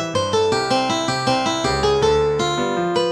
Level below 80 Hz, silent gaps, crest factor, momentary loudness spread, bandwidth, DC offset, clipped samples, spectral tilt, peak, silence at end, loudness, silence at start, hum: -40 dBFS; none; 14 dB; 3 LU; 12.5 kHz; under 0.1%; under 0.1%; -4 dB/octave; -4 dBFS; 0 s; -19 LUFS; 0 s; none